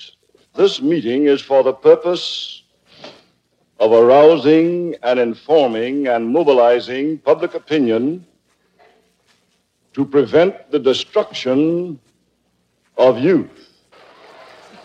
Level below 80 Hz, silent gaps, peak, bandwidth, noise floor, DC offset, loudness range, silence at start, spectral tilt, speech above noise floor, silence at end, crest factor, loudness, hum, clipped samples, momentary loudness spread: -68 dBFS; none; 0 dBFS; 8.2 kHz; -64 dBFS; under 0.1%; 6 LU; 0 s; -6 dB/octave; 50 dB; 1.4 s; 16 dB; -15 LUFS; 60 Hz at -50 dBFS; under 0.1%; 11 LU